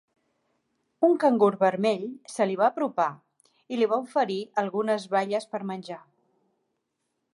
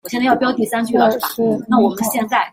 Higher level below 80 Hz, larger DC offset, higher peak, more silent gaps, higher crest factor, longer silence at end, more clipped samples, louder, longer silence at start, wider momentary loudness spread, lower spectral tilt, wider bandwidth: second, -80 dBFS vs -58 dBFS; neither; second, -10 dBFS vs -2 dBFS; neither; about the same, 18 dB vs 14 dB; first, 1.35 s vs 0.05 s; neither; second, -26 LUFS vs -16 LUFS; first, 1 s vs 0.05 s; first, 13 LU vs 4 LU; first, -6 dB/octave vs -4.5 dB/octave; second, 11.5 kHz vs 16.5 kHz